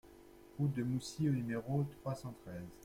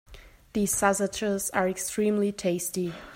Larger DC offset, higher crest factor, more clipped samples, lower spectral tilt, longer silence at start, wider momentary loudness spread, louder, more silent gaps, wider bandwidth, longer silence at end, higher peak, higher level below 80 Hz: neither; about the same, 16 dB vs 20 dB; neither; first, -7 dB/octave vs -4 dB/octave; about the same, 0.05 s vs 0.1 s; first, 13 LU vs 6 LU; second, -39 LUFS vs -27 LUFS; neither; about the same, 16 kHz vs 16 kHz; about the same, 0 s vs 0 s; second, -24 dBFS vs -8 dBFS; second, -64 dBFS vs -54 dBFS